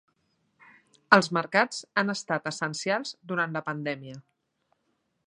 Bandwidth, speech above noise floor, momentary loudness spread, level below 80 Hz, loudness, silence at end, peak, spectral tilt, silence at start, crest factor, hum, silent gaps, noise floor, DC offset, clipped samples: 11 kHz; 48 dB; 12 LU; -76 dBFS; -27 LUFS; 1.05 s; -2 dBFS; -4 dB/octave; 1.1 s; 28 dB; none; none; -76 dBFS; under 0.1%; under 0.1%